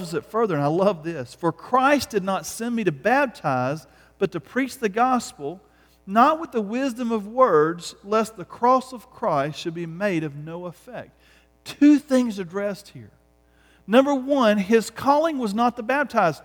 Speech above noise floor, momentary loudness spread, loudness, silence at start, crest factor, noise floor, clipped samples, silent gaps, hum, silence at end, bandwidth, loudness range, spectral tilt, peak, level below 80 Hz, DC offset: 36 dB; 15 LU; -22 LUFS; 0 s; 18 dB; -59 dBFS; under 0.1%; none; none; 0.05 s; 19 kHz; 4 LU; -5.5 dB/octave; -4 dBFS; -60 dBFS; under 0.1%